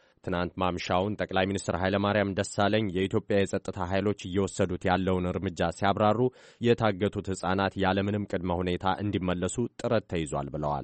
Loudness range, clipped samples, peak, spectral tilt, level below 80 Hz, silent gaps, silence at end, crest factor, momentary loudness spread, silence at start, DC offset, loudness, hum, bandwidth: 2 LU; under 0.1%; -10 dBFS; -6 dB/octave; -54 dBFS; none; 0 s; 18 dB; 6 LU; 0.25 s; under 0.1%; -28 LUFS; none; 8.8 kHz